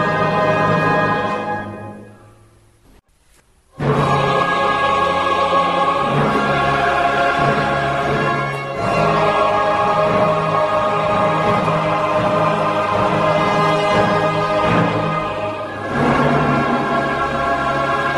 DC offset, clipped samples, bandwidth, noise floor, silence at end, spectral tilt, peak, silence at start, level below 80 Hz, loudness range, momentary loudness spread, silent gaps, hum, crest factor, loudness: under 0.1%; under 0.1%; 12.5 kHz; -54 dBFS; 0 s; -6 dB/octave; -4 dBFS; 0 s; -42 dBFS; 4 LU; 5 LU; none; none; 14 dB; -17 LUFS